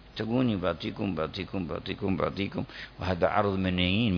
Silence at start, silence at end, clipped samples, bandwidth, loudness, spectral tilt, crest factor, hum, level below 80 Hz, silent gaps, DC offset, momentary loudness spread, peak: 0.05 s; 0 s; under 0.1%; 5.4 kHz; -30 LUFS; -8 dB/octave; 20 dB; none; -52 dBFS; none; under 0.1%; 8 LU; -10 dBFS